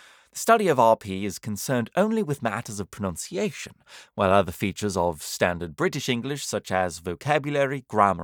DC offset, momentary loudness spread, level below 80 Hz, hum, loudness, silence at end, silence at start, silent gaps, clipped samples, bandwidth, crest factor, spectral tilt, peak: under 0.1%; 11 LU; -60 dBFS; none; -25 LUFS; 0 s; 0.35 s; none; under 0.1%; over 20 kHz; 22 dB; -5 dB/octave; -4 dBFS